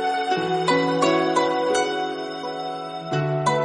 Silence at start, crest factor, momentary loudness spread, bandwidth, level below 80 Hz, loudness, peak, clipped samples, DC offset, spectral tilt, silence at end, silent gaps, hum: 0 s; 16 dB; 10 LU; 10.5 kHz; -62 dBFS; -23 LUFS; -6 dBFS; under 0.1%; under 0.1%; -5 dB/octave; 0 s; none; none